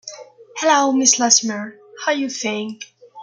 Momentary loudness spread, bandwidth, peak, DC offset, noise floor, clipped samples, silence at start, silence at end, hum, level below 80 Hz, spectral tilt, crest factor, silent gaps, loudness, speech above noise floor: 22 LU; 11 kHz; 0 dBFS; under 0.1%; -38 dBFS; under 0.1%; 0.05 s; 0 s; none; -74 dBFS; -1 dB/octave; 20 dB; none; -17 LUFS; 20 dB